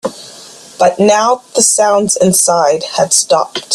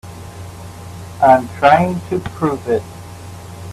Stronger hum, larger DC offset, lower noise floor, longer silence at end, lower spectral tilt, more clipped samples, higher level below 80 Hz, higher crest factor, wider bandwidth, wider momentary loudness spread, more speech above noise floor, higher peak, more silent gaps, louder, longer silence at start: neither; neither; about the same, -35 dBFS vs -33 dBFS; about the same, 0 s vs 0 s; second, -2.5 dB/octave vs -6.5 dB/octave; neither; second, -54 dBFS vs -48 dBFS; second, 12 dB vs 18 dB; first, 16 kHz vs 14.5 kHz; second, 5 LU vs 22 LU; first, 24 dB vs 18 dB; about the same, 0 dBFS vs 0 dBFS; neither; first, -10 LUFS vs -15 LUFS; about the same, 0.05 s vs 0.05 s